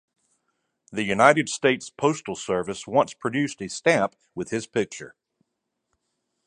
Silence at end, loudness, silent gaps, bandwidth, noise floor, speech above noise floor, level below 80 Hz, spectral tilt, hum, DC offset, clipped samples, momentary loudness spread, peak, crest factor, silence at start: 1.4 s; -24 LUFS; none; 11 kHz; -80 dBFS; 56 dB; -64 dBFS; -4.5 dB/octave; none; under 0.1%; under 0.1%; 14 LU; 0 dBFS; 26 dB; 0.9 s